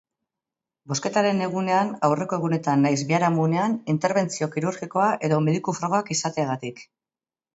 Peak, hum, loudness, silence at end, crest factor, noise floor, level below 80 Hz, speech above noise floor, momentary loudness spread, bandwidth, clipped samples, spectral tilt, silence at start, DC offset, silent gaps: -6 dBFS; none; -23 LUFS; 0.75 s; 18 dB; under -90 dBFS; -68 dBFS; over 67 dB; 6 LU; 8 kHz; under 0.1%; -5.5 dB/octave; 0.85 s; under 0.1%; none